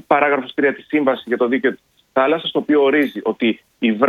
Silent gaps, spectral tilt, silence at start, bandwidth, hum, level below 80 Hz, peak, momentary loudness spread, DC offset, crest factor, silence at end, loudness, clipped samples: none; -7 dB/octave; 0.1 s; 13.5 kHz; none; -66 dBFS; 0 dBFS; 6 LU; under 0.1%; 18 dB; 0 s; -18 LUFS; under 0.1%